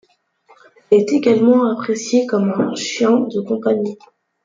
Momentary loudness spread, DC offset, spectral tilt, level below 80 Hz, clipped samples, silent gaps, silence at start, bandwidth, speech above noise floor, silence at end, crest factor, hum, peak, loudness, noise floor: 8 LU; under 0.1%; -5.5 dB/octave; -66 dBFS; under 0.1%; none; 0.9 s; 7.6 kHz; 38 dB; 0.5 s; 16 dB; none; -2 dBFS; -17 LUFS; -54 dBFS